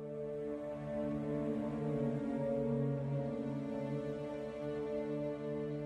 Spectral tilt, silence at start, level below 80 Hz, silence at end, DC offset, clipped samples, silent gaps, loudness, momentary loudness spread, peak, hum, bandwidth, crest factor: -9.5 dB/octave; 0 s; -62 dBFS; 0 s; under 0.1%; under 0.1%; none; -39 LUFS; 6 LU; -24 dBFS; none; 9.6 kHz; 14 dB